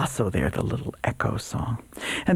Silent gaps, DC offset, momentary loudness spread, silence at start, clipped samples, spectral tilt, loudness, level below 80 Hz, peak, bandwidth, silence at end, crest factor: none; under 0.1%; 5 LU; 0 s; under 0.1%; -5.5 dB/octave; -28 LUFS; -42 dBFS; -8 dBFS; 15.5 kHz; 0 s; 18 dB